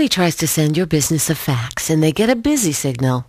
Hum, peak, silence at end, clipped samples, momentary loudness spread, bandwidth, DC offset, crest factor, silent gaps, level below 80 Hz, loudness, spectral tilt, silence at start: none; -2 dBFS; 0.05 s; under 0.1%; 4 LU; 15.5 kHz; under 0.1%; 14 dB; none; -44 dBFS; -17 LUFS; -4.5 dB/octave; 0 s